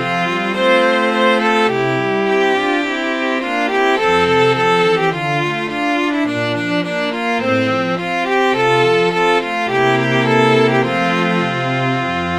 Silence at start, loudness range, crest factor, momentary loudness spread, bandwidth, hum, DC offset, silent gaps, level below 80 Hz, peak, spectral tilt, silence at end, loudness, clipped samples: 0 s; 3 LU; 14 dB; 5 LU; 13.5 kHz; none; 0.1%; none; -52 dBFS; 0 dBFS; -5.5 dB/octave; 0 s; -15 LUFS; under 0.1%